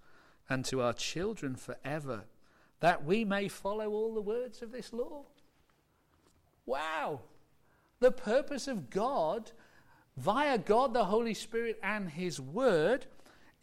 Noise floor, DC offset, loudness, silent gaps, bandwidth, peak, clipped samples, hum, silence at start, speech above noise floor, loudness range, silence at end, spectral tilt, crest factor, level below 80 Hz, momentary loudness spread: -71 dBFS; under 0.1%; -33 LUFS; none; 16 kHz; -18 dBFS; under 0.1%; none; 0.05 s; 38 dB; 8 LU; 0.4 s; -5 dB/octave; 18 dB; -60 dBFS; 13 LU